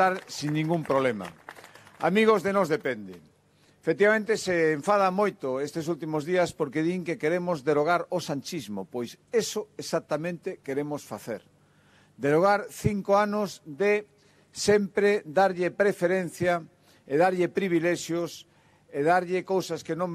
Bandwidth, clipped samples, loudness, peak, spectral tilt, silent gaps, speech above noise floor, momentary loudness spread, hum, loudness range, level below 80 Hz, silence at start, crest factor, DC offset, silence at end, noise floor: 14.5 kHz; under 0.1%; -27 LUFS; -10 dBFS; -5.5 dB/octave; none; 36 dB; 13 LU; none; 4 LU; -64 dBFS; 0 s; 18 dB; under 0.1%; 0 s; -62 dBFS